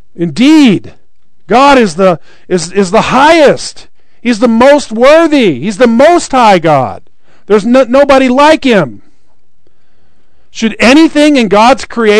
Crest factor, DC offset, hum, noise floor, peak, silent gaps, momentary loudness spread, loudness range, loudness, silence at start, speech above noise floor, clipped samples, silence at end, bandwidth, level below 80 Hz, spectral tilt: 8 dB; 4%; none; -56 dBFS; 0 dBFS; none; 11 LU; 3 LU; -6 LUFS; 0.2 s; 50 dB; 10%; 0 s; 12 kHz; -38 dBFS; -5 dB/octave